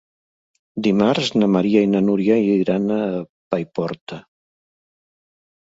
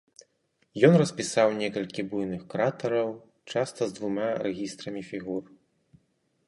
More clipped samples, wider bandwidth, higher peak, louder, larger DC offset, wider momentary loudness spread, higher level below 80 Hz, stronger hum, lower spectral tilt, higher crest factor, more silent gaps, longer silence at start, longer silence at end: neither; second, 7.8 kHz vs 11.5 kHz; about the same, -4 dBFS vs -6 dBFS; first, -19 LUFS vs -28 LUFS; neither; about the same, 14 LU vs 14 LU; first, -60 dBFS vs -68 dBFS; neither; about the same, -7 dB/octave vs -6 dB/octave; second, 18 dB vs 24 dB; first, 3.29-3.51 s, 4.01-4.07 s vs none; about the same, 0.75 s vs 0.75 s; first, 1.55 s vs 1.05 s